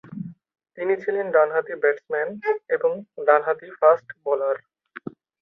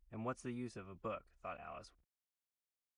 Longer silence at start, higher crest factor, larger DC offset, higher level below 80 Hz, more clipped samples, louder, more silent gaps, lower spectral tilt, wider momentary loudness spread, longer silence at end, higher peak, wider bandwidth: about the same, 0.05 s vs 0.1 s; about the same, 20 dB vs 18 dB; neither; about the same, -74 dBFS vs -72 dBFS; neither; first, -23 LUFS vs -47 LUFS; neither; first, -8.5 dB/octave vs -6.5 dB/octave; first, 18 LU vs 9 LU; second, 0.35 s vs 1.05 s; first, -4 dBFS vs -30 dBFS; second, 5.2 kHz vs 10.5 kHz